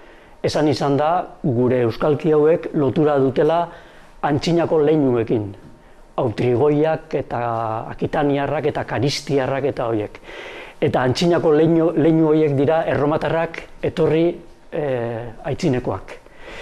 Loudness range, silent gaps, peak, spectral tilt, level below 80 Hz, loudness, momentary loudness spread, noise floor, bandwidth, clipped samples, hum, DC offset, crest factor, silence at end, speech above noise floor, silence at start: 4 LU; none; -6 dBFS; -7 dB/octave; -46 dBFS; -19 LUFS; 12 LU; -44 dBFS; 12 kHz; under 0.1%; none; under 0.1%; 12 dB; 0 s; 25 dB; 0 s